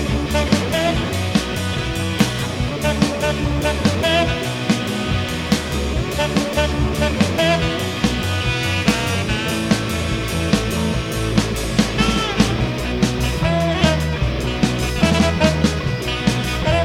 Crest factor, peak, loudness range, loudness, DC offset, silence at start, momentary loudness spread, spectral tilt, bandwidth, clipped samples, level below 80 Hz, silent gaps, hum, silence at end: 18 dB; 0 dBFS; 1 LU; -19 LUFS; under 0.1%; 0 s; 5 LU; -5 dB/octave; 16.5 kHz; under 0.1%; -28 dBFS; none; none; 0 s